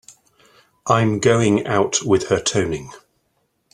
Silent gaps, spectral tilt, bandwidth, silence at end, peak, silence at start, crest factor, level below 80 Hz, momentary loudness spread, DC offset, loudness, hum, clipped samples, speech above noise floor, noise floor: none; -4.5 dB/octave; 11.5 kHz; 0.75 s; 0 dBFS; 0.85 s; 20 dB; -52 dBFS; 12 LU; under 0.1%; -18 LUFS; none; under 0.1%; 50 dB; -68 dBFS